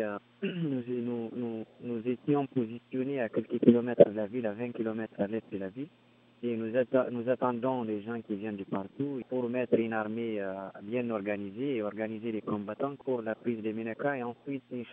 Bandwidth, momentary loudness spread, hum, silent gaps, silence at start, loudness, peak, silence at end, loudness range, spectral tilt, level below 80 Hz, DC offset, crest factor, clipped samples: 3.8 kHz; 11 LU; none; none; 0 s; -32 LUFS; -4 dBFS; 0 s; 6 LU; -6.5 dB/octave; -80 dBFS; under 0.1%; 28 dB; under 0.1%